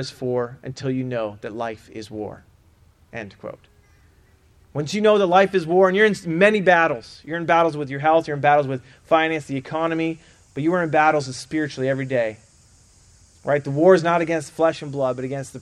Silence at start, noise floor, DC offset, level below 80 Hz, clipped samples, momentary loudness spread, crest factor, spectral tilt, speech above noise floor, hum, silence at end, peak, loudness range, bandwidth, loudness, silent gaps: 0 s; -55 dBFS; under 0.1%; -58 dBFS; under 0.1%; 17 LU; 20 dB; -6 dB/octave; 34 dB; none; 0 s; -2 dBFS; 13 LU; 12 kHz; -20 LUFS; none